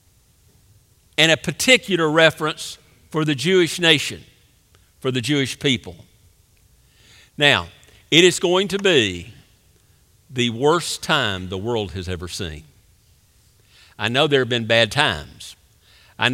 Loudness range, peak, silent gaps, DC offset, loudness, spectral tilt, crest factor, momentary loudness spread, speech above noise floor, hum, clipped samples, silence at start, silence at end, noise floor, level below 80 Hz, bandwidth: 6 LU; 0 dBFS; none; under 0.1%; -18 LUFS; -3.5 dB/octave; 22 dB; 16 LU; 37 dB; none; under 0.1%; 1.2 s; 0 s; -56 dBFS; -52 dBFS; 16.5 kHz